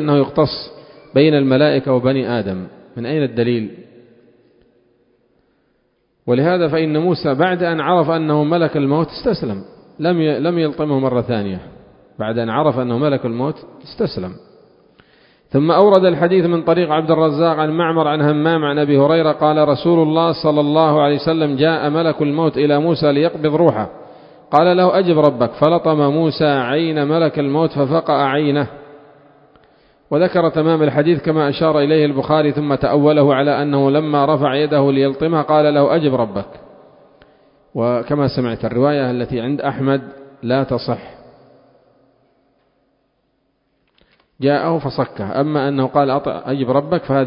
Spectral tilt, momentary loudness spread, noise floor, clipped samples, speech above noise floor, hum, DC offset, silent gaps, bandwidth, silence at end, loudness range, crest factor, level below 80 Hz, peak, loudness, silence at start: -10 dB/octave; 9 LU; -65 dBFS; under 0.1%; 50 dB; none; under 0.1%; none; 5.4 kHz; 0 s; 8 LU; 16 dB; -50 dBFS; 0 dBFS; -16 LUFS; 0 s